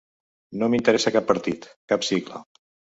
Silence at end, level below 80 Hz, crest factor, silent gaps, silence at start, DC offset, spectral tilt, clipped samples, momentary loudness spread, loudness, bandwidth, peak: 0.55 s; -60 dBFS; 22 dB; 1.76-1.88 s; 0.5 s; under 0.1%; -4.5 dB/octave; under 0.1%; 17 LU; -23 LUFS; 8 kHz; -2 dBFS